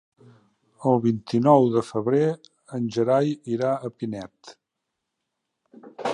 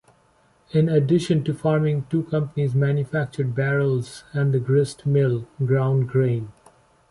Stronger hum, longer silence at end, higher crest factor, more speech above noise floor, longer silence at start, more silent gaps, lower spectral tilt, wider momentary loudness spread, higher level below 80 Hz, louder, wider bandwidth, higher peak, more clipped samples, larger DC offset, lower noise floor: neither; second, 0 s vs 0.6 s; first, 20 dB vs 14 dB; first, 59 dB vs 39 dB; about the same, 0.8 s vs 0.75 s; neither; about the same, -8 dB/octave vs -8 dB/octave; first, 15 LU vs 6 LU; second, -68 dBFS vs -56 dBFS; about the same, -23 LUFS vs -22 LUFS; about the same, 10.5 kHz vs 11.5 kHz; first, -4 dBFS vs -8 dBFS; neither; neither; first, -82 dBFS vs -60 dBFS